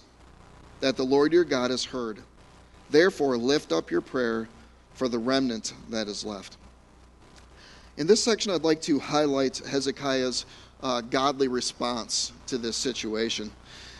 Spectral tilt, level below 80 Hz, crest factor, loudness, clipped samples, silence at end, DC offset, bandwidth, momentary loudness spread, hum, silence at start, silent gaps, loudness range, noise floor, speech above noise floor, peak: -3.5 dB/octave; -56 dBFS; 22 dB; -26 LUFS; under 0.1%; 0 s; under 0.1%; 11.5 kHz; 12 LU; none; 0.6 s; none; 5 LU; -54 dBFS; 28 dB; -6 dBFS